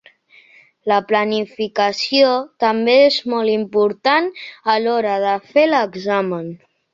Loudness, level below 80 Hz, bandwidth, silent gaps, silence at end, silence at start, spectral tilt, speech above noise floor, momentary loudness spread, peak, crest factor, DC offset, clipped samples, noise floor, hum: -17 LUFS; -66 dBFS; 7.6 kHz; none; 0.4 s; 0.85 s; -5 dB/octave; 33 dB; 9 LU; -2 dBFS; 16 dB; under 0.1%; under 0.1%; -50 dBFS; none